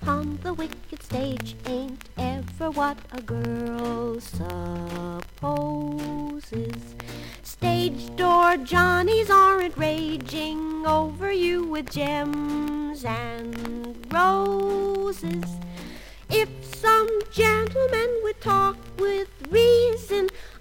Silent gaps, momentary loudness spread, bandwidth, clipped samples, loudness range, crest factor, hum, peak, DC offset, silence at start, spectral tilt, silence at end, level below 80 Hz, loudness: none; 14 LU; 17 kHz; under 0.1%; 9 LU; 18 dB; none; -6 dBFS; under 0.1%; 0 s; -5.5 dB/octave; 0 s; -46 dBFS; -24 LUFS